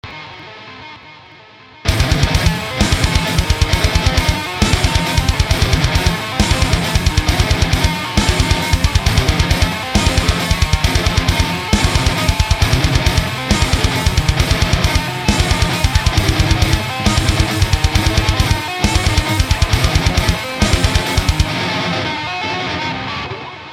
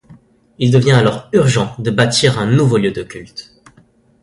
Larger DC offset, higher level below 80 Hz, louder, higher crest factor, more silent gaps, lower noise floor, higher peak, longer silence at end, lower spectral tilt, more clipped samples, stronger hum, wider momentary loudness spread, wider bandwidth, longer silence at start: first, 0.1% vs under 0.1%; first, -20 dBFS vs -46 dBFS; about the same, -15 LUFS vs -14 LUFS; about the same, 14 dB vs 16 dB; neither; second, -41 dBFS vs -51 dBFS; about the same, 0 dBFS vs 0 dBFS; second, 0 s vs 0.8 s; about the same, -4.5 dB/octave vs -5.5 dB/octave; neither; neither; second, 5 LU vs 17 LU; first, 16.5 kHz vs 11.5 kHz; about the same, 0.05 s vs 0.1 s